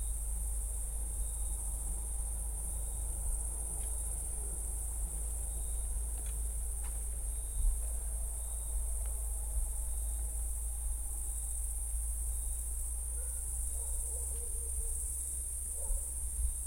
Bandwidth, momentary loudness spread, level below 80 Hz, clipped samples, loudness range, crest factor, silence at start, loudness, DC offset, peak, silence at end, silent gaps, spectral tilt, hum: 16.5 kHz; 2 LU; -38 dBFS; under 0.1%; 1 LU; 16 dB; 0 s; -38 LUFS; under 0.1%; -22 dBFS; 0 s; none; -3.5 dB/octave; none